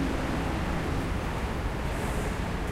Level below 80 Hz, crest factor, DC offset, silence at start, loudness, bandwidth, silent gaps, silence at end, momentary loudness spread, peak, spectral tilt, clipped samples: -34 dBFS; 12 dB; under 0.1%; 0 s; -31 LUFS; 16 kHz; none; 0 s; 2 LU; -18 dBFS; -6 dB/octave; under 0.1%